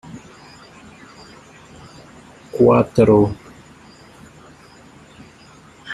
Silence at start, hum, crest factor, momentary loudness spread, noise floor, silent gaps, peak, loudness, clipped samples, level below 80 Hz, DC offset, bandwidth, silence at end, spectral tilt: 0.1 s; none; 20 dB; 28 LU; -46 dBFS; none; -2 dBFS; -15 LUFS; under 0.1%; -50 dBFS; under 0.1%; 12 kHz; 0 s; -8 dB/octave